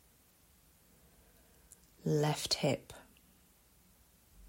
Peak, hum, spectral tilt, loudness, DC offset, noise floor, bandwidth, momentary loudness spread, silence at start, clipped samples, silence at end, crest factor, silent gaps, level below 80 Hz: -18 dBFS; none; -4.5 dB/octave; -34 LUFS; under 0.1%; -67 dBFS; 16 kHz; 20 LU; 2.05 s; under 0.1%; 0 s; 22 dB; none; -68 dBFS